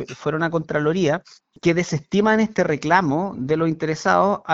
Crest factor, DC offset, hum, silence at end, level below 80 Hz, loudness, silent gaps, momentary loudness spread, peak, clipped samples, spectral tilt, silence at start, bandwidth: 20 dB; under 0.1%; none; 0 s; -54 dBFS; -21 LUFS; none; 5 LU; -2 dBFS; under 0.1%; -6 dB/octave; 0 s; 8 kHz